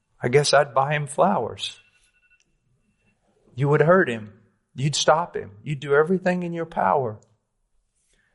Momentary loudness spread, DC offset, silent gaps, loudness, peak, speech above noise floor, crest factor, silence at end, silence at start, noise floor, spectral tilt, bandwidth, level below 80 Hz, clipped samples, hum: 14 LU; under 0.1%; none; -22 LUFS; -6 dBFS; 48 dB; 18 dB; 1.2 s; 0.2 s; -69 dBFS; -5 dB/octave; 11.5 kHz; -62 dBFS; under 0.1%; none